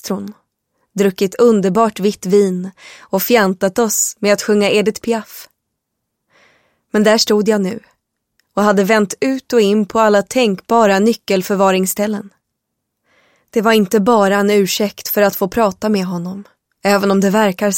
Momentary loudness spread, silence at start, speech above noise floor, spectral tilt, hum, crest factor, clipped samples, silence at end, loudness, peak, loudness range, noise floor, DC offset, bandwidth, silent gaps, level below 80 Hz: 11 LU; 0.05 s; 60 dB; -4.5 dB/octave; none; 16 dB; under 0.1%; 0 s; -14 LUFS; 0 dBFS; 3 LU; -75 dBFS; under 0.1%; 17 kHz; none; -56 dBFS